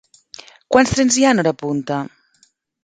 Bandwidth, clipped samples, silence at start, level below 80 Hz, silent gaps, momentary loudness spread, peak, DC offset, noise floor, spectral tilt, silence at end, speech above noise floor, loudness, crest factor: 9.6 kHz; under 0.1%; 0.7 s; -46 dBFS; none; 11 LU; 0 dBFS; under 0.1%; -59 dBFS; -4 dB/octave; 0.8 s; 43 dB; -16 LUFS; 18 dB